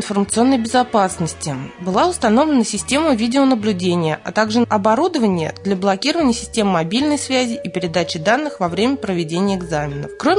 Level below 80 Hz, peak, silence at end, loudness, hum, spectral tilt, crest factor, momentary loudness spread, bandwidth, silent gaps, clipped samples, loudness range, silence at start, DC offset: -48 dBFS; -2 dBFS; 0 s; -18 LUFS; none; -4.5 dB/octave; 14 dB; 6 LU; 11 kHz; none; under 0.1%; 2 LU; 0 s; under 0.1%